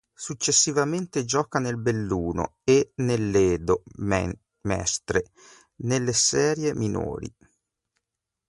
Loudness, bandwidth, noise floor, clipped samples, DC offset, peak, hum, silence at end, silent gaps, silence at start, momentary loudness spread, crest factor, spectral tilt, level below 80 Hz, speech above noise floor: -24 LUFS; 11.5 kHz; -85 dBFS; under 0.1%; under 0.1%; -8 dBFS; none; 1.2 s; none; 0.2 s; 13 LU; 18 dB; -4 dB/octave; -46 dBFS; 60 dB